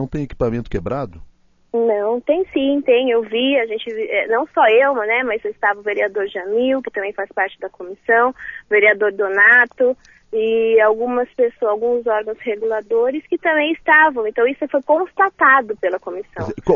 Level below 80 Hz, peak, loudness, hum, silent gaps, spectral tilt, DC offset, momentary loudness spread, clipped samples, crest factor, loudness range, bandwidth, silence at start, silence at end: -44 dBFS; -2 dBFS; -17 LUFS; none; none; -7 dB/octave; under 0.1%; 12 LU; under 0.1%; 16 dB; 4 LU; 6.8 kHz; 0 s; 0 s